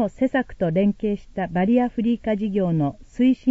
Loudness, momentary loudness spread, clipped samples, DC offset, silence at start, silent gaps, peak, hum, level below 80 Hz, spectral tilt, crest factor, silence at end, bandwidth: -22 LUFS; 7 LU; under 0.1%; under 0.1%; 0 s; none; -8 dBFS; none; -46 dBFS; -9 dB/octave; 14 dB; 0 s; 7.8 kHz